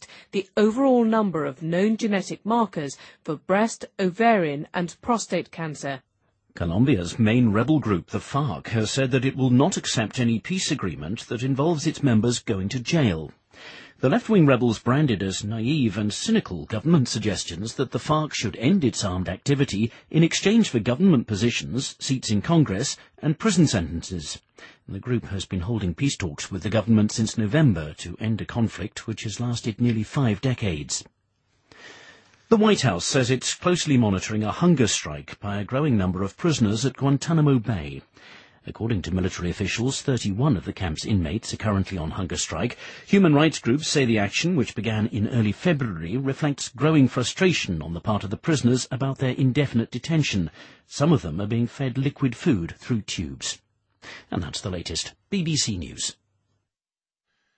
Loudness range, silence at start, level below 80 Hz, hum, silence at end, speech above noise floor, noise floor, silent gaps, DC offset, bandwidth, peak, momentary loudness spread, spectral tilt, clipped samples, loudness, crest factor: 5 LU; 0 s; -48 dBFS; none; 1.45 s; over 67 dB; under -90 dBFS; none; under 0.1%; 8.8 kHz; -4 dBFS; 11 LU; -5.5 dB/octave; under 0.1%; -24 LUFS; 20 dB